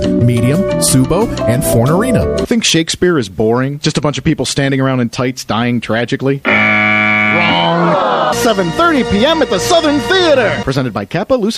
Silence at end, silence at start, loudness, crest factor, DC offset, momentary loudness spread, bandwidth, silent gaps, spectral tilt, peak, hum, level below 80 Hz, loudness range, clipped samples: 0 s; 0 s; -12 LUFS; 12 dB; under 0.1%; 6 LU; 15.5 kHz; none; -4.5 dB/octave; 0 dBFS; none; -34 dBFS; 3 LU; under 0.1%